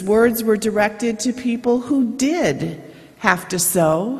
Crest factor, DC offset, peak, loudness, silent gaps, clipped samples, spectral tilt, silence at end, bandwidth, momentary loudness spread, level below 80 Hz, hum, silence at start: 18 dB; under 0.1%; 0 dBFS; -19 LUFS; none; under 0.1%; -4.5 dB/octave; 0 s; 14.5 kHz; 6 LU; -52 dBFS; none; 0 s